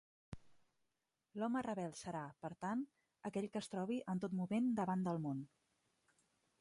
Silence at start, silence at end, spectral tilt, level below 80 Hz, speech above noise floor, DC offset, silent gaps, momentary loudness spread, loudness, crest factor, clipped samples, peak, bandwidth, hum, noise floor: 0.3 s; 1.15 s; -7 dB/octave; -76 dBFS; 47 dB; under 0.1%; none; 17 LU; -43 LUFS; 16 dB; under 0.1%; -28 dBFS; 11.5 kHz; none; -88 dBFS